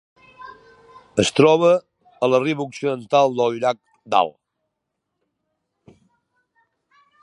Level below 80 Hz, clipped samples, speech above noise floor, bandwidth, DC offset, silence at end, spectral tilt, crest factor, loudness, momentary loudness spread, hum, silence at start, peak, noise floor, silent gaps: -60 dBFS; under 0.1%; 61 dB; 11 kHz; under 0.1%; 2.9 s; -5 dB/octave; 20 dB; -19 LUFS; 14 LU; none; 0.4 s; -2 dBFS; -79 dBFS; none